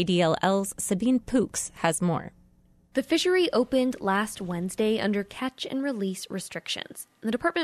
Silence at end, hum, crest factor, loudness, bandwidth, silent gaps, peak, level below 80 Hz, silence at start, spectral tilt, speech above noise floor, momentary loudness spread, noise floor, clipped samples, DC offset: 0 s; none; 18 dB; -27 LUFS; 13.5 kHz; none; -10 dBFS; -58 dBFS; 0 s; -4.5 dB/octave; 34 dB; 10 LU; -60 dBFS; under 0.1%; under 0.1%